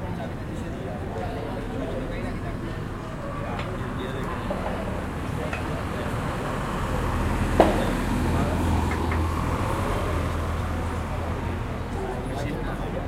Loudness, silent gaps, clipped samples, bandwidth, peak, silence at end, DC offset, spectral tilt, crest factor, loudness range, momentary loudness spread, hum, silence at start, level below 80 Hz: -28 LUFS; none; under 0.1%; 15.5 kHz; 0 dBFS; 0 s; under 0.1%; -6.5 dB/octave; 26 dB; 7 LU; 8 LU; none; 0 s; -34 dBFS